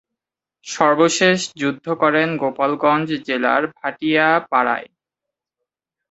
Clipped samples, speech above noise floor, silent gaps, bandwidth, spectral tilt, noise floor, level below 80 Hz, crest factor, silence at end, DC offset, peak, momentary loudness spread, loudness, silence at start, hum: under 0.1%; 67 dB; none; 8.2 kHz; -4 dB/octave; -85 dBFS; -64 dBFS; 20 dB; 1.3 s; under 0.1%; 0 dBFS; 9 LU; -18 LUFS; 0.65 s; none